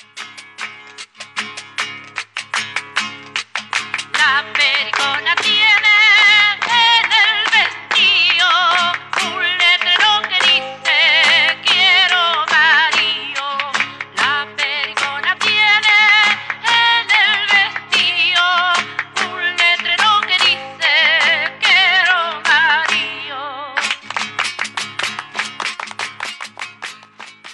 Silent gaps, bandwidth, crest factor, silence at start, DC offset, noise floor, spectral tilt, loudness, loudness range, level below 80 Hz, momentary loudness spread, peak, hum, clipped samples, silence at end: none; 11.5 kHz; 12 dB; 0.15 s; under 0.1%; -39 dBFS; 0.5 dB/octave; -13 LUFS; 11 LU; -78 dBFS; 15 LU; -2 dBFS; none; under 0.1%; 0 s